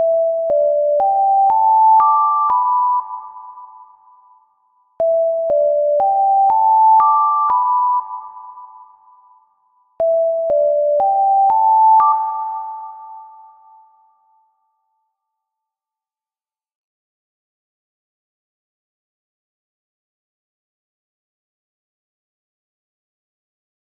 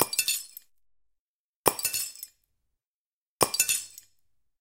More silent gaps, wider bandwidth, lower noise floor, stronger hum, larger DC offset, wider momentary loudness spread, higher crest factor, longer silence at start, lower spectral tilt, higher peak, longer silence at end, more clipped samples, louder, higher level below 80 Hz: second, none vs 1.19-1.64 s, 2.86-3.40 s; second, 2.5 kHz vs 17 kHz; about the same, under -90 dBFS vs under -90 dBFS; neither; neither; about the same, 19 LU vs 20 LU; second, 14 dB vs 32 dB; about the same, 0 s vs 0 s; first, -8 dB/octave vs -1 dB/octave; second, -4 dBFS vs 0 dBFS; first, 10.75 s vs 0.7 s; neither; first, -14 LUFS vs -27 LUFS; about the same, -64 dBFS vs -64 dBFS